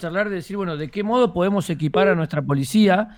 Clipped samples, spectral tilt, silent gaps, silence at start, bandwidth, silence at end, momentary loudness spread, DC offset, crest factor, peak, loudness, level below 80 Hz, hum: under 0.1%; -6.5 dB/octave; none; 0 s; 17 kHz; 0 s; 9 LU; under 0.1%; 14 dB; -6 dBFS; -21 LUFS; -52 dBFS; none